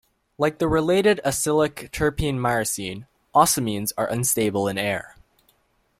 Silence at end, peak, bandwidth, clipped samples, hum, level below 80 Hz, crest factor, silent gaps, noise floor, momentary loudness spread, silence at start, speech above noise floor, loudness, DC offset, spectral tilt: 0.9 s; -2 dBFS; 16.5 kHz; under 0.1%; none; -46 dBFS; 20 dB; none; -65 dBFS; 7 LU; 0.4 s; 43 dB; -22 LUFS; under 0.1%; -4 dB/octave